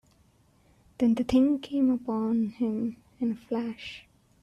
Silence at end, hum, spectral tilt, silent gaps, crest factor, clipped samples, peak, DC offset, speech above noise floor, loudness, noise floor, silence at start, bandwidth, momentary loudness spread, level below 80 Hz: 0.4 s; none; -7 dB/octave; none; 16 dB; under 0.1%; -12 dBFS; under 0.1%; 36 dB; -28 LUFS; -63 dBFS; 1 s; 9.6 kHz; 12 LU; -58 dBFS